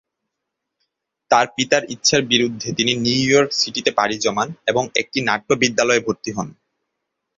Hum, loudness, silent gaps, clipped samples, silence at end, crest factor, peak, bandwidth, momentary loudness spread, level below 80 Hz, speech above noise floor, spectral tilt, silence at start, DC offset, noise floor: none; -18 LUFS; none; under 0.1%; 0.9 s; 20 dB; 0 dBFS; 7.8 kHz; 6 LU; -58 dBFS; 61 dB; -3 dB/octave; 1.3 s; under 0.1%; -80 dBFS